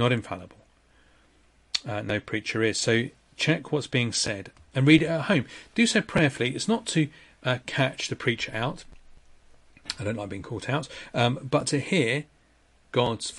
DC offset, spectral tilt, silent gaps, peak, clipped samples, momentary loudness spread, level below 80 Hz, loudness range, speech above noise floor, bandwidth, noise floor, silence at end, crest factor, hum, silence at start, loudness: under 0.1%; -4.5 dB/octave; none; -4 dBFS; under 0.1%; 11 LU; -56 dBFS; 7 LU; 35 dB; 11.5 kHz; -61 dBFS; 0 s; 22 dB; none; 0 s; -26 LUFS